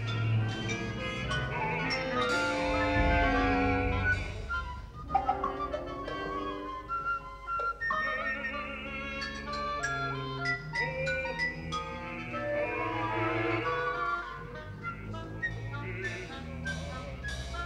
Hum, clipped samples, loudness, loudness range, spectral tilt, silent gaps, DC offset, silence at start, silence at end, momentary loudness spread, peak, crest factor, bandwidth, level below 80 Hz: none; under 0.1%; -32 LUFS; 6 LU; -5.5 dB/octave; none; under 0.1%; 0 s; 0 s; 10 LU; -16 dBFS; 16 dB; 11.5 kHz; -44 dBFS